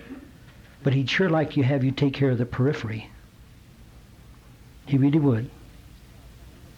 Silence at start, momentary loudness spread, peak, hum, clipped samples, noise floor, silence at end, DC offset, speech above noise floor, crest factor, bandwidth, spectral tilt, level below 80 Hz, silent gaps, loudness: 0 s; 19 LU; -12 dBFS; none; under 0.1%; -50 dBFS; 0.25 s; under 0.1%; 27 dB; 14 dB; 7.4 kHz; -7.5 dB/octave; -52 dBFS; none; -24 LUFS